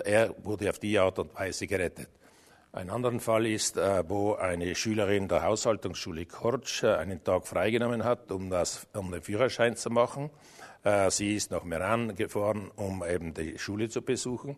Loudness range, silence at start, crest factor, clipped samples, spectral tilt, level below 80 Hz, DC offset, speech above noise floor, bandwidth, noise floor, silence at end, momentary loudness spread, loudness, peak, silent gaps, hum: 2 LU; 0 s; 20 dB; under 0.1%; -4.5 dB/octave; -58 dBFS; under 0.1%; 29 dB; 13.5 kHz; -59 dBFS; 0 s; 10 LU; -30 LUFS; -10 dBFS; none; none